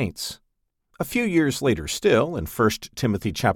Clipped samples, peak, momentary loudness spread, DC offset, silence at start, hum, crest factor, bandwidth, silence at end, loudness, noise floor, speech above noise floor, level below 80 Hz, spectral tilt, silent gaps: under 0.1%; -4 dBFS; 12 LU; under 0.1%; 0 s; none; 18 dB; 19.5 kHz; 0 s; -23 LUFS; -73 dBFS; 50 dB; -46 dBFS; -5 dB/octave; none